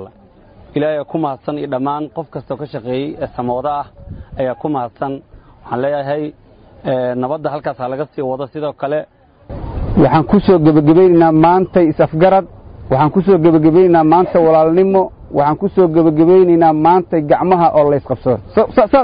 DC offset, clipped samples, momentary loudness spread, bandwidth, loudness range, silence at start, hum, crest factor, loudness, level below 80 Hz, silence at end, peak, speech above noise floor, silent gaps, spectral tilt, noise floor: under 0.1%; under 0.1%; 15 LU; 5.2 kHz; 10 LU; 0 s; none; 12 dB; -13 LUFS; -38 dBFS; 0 s; -2 dBFS; 32 dB; none; -13.5 dB/octave; -44 dBFS